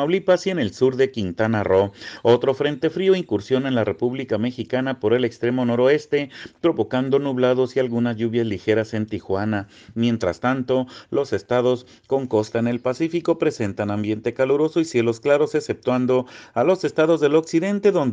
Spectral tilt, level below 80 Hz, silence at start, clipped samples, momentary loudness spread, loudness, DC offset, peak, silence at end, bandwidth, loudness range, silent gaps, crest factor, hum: -6.5 dB/octave; -60 dBFS; 0 s; under 0.1%; 6 LU; -21 LUFS; under 0.1%; -4 dBFS; 0 s; 9.4 kHz; 3 LU; none; 16 dB; none